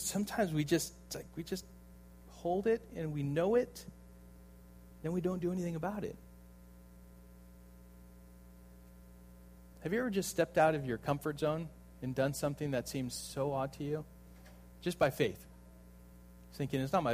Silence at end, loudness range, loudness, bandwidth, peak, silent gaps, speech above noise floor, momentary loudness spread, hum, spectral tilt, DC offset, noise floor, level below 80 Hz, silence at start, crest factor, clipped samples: 0 s; 11 LU; -36 LUFS; 15.5 kHz; -16 dBFS; none; 21 dB; 26 LU; 60 Hz at -55 dBFS; -5.5 dB/octave; under 0.1%; -56 dBFS; -58 dBFS; 0 s; 22 dB; under 0.1%